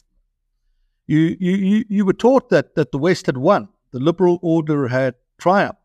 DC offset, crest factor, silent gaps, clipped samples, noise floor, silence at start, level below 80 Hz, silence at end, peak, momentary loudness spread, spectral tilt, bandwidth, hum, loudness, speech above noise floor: under 0.1%; 16 dB; none; under 0.1%; -68 dBFS; 1.1 s; -56 dBFS; 0.15 s; -2 dBFS; 6 LU; -7.5 dB/octave; 10.5 kHz; none; -18 LUFS; 51 dB